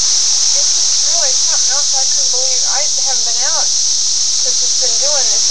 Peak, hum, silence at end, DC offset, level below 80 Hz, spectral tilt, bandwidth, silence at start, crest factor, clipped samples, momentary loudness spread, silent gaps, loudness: -2 dBFS; none; 0 s; 9%; -62 dBFS; 3 dB/octave; 16 kHz; 0 s; 12 dB; under 0.1%; 2 LU; none; -10 LUFS